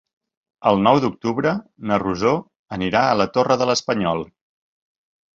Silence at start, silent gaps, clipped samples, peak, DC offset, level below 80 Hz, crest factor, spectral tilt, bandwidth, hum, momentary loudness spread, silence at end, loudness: 0.6 s; 2.56-2.66 s; under 0.1%; -2 dBFS; under 0.1%; -52 dBFS; 18 dB; -5.5 dB/octave; 7.8 kHz; none; 10 LU; 1.15 s; -20 LUFS